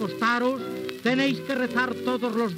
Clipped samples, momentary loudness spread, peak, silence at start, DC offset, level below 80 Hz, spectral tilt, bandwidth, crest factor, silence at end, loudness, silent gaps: under 0.1%; 5 LU; -8 dBFS; 0 s; under 0.1%; -78 dBFS; -5 dB/octave; 16 kHz; 16 dB; 0 s; -25 LUFS; none